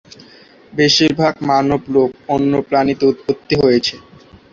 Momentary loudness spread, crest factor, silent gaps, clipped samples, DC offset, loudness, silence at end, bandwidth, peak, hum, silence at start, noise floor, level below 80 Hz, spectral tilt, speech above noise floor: 6 LU; 16 dB; none; under 0.1%; under 0.1%; -15 LUFS; 0.55 s; 7.6 kHz; 0 dBFS; none; 0.75 s; -44 dBFS; -48 dBFS; -5 dB/octave; 29 dB